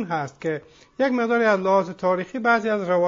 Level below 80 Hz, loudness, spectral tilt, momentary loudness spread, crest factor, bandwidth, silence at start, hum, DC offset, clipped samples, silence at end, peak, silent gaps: -66 dBFS; -22 LUFS; -6.5 dB/octave; 9 LU; 16 dB; 7.6 kHz; 0 s; none; under 0.1%; under 0.1%; 0 s; -6 dBFS; none